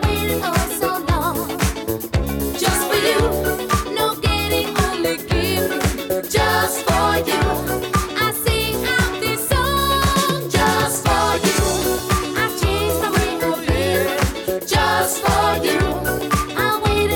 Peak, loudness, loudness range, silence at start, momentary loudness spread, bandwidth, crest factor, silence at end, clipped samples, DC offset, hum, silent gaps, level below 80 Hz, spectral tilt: -2 dBFS; -19 LUFS; 2 LU; 0 s; 4 LU; over 20 kHz; 16 dB; 0 s; under 0.1%; under 0.1%; none; none; -30 dBFS; -4 dB/octave